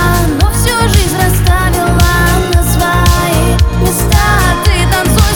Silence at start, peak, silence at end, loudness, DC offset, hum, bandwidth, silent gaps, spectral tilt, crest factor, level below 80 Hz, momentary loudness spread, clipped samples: 0 s; 0 dBFS; 0 s; -10 LUFS; under 0.1%; none; over 20 kHz; none; -4.5 dB/octave; 8 dB; -14 dBFS; 2 LU; 0.1%